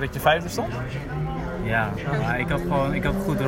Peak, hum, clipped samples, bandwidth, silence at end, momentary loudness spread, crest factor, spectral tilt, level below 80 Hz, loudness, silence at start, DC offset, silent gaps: -6 dBFS; none; under 0.1%; 16.5 kHz; 0 s; 8 LU; 18 dB; -6 dB/octave; -36 dBFS; -25 LUFS; 0 s; under 0.1%; none